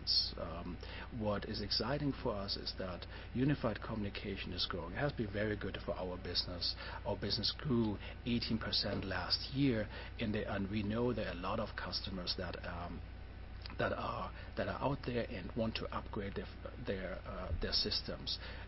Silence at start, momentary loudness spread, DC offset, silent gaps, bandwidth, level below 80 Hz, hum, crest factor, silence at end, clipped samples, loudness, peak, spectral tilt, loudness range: 0 s; 10 LU; under 0.1%; none; 6 kHz; -50 dBFS; none; 18 dB; 0 s; under 0.1%; -39 LUFS; -22 dBFS; -8.5 dB/octave; 4 LU